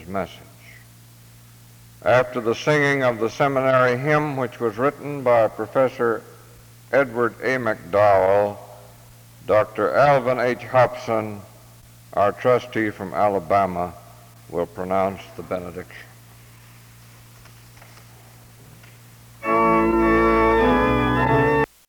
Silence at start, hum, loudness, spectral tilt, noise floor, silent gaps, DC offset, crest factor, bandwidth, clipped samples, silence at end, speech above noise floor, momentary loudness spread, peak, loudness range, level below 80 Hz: 0 s; none; -20 LUFS; -6.5 dB/octave; -47 dBFS; none; under 0.1%; 18 dB; over 20 kHz; under 0.1%; 0.25 s; 27 dB; 13 LU; -4 dBFS; 10 LU; -42 dBFS